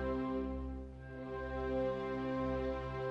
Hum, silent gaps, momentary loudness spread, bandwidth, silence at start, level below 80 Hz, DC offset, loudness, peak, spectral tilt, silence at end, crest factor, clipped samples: none; none; 9 LU; 7.2 kHz; 0 s; -48 dBFS; under 0.1%; -40 LUFS; -26 dBFS; -8.5 dB/octave; 0 s; 12 dB; under 0.1%